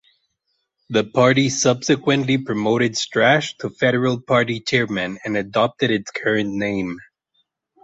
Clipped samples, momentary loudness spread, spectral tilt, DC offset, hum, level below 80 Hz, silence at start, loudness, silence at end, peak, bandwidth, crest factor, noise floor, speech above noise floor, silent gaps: under 0.1%; 8 LU; -4.5 dB/octave; under 0.1%; none; -56 dBFS; 0.9 s; -19 LUFS; 0.8 s; -2 dBFS; 8.2 kHz; 18 dB; -73 dBFS; 54 dB; none